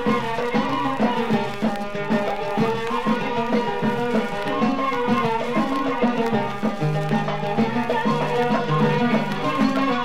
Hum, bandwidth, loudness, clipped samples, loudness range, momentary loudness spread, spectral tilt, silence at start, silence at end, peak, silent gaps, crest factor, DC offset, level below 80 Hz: none; 15 kHz; -22 LUFS; under 0.1%; 1 LU; 4 LU; -6.5 dB/octave; 0 s; 0 s; -8 dBFS; none; 14 dB; 2%; -48 dBFS